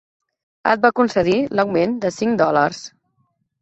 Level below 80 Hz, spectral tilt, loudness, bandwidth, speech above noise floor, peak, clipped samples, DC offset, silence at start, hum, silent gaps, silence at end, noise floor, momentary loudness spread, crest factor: -56 dBFS; -5.5 dB/octave; -18 LUFS; 8.2 kHz; 50 dB; 0 dBFS; under 0.1%; under 0.1%; 0.65 s; none; none; 0.75 s; -67 dBFS; 7 LU; 20 dB